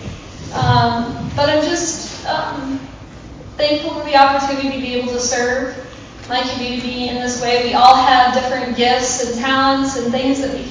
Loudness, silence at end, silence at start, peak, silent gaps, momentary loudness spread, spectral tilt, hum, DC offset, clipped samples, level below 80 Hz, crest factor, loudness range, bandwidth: -16 LUFS; 0 s; 0 s; 0 dBFS; none; 16 LU; -3.5 dB/octave; none; under 0.1%; 0.1%; -40 dBFS; 16 dB; 5 LU; 8 kHz